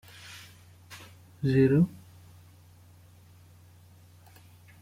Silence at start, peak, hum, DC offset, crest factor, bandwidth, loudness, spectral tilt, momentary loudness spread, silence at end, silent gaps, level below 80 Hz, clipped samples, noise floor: 0.3 s; -12 dBFS; none; under 0.1%; 20 dB; 16 kHz; -25 LUFS; -8 dB/octave; 29 LU; 2.9 s; none; -60 dBFS; under 0.1%; -55 dBFS